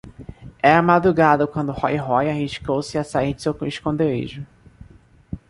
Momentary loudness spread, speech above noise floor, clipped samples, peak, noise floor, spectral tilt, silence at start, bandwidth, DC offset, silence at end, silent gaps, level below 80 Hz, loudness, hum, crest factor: 22 LU; 30 dB; under 0.1%; -2 dBFS; -49 dBFS; -6.5 dB/octave; 0.05 s; 11.5 kHz; under 0.1%; 0.1 s; none; -46 dBFS; -20 LUFS; none; 20 dB